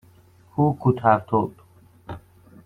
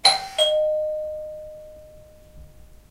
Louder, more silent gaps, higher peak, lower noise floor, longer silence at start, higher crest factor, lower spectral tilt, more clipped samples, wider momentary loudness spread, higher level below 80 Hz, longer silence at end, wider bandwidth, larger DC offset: about the same, -22 LUFS vs -22 LUFS; neither; about the same, -2 dBFS vs -2 dBFS; first, -53 dBFS vs -47 dBFS; first, 0.55 s vs 0.05 s; about the same, 22 dB vs 24 dB; first, -10 dB/octave vs 0 dB/octave; neither; about the same, 21 LU vs 22 LU; about the same, -56 dBFS vs -52 dBFS; first, 0.5 s vs 0.25 s; second, 4.7 kHz vs 16 kHz; neither